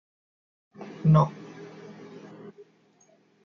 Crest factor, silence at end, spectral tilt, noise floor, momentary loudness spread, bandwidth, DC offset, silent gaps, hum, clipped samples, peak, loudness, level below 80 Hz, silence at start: 22 dB; 0.95 s; -9.5 dB/octave; -62 dBFS; 25 LU; 6.4 kHz; under 0.1%; none; none; under 0.1%; -8 dBFS; -23 LUFS; -58 dBFS; 0.8 s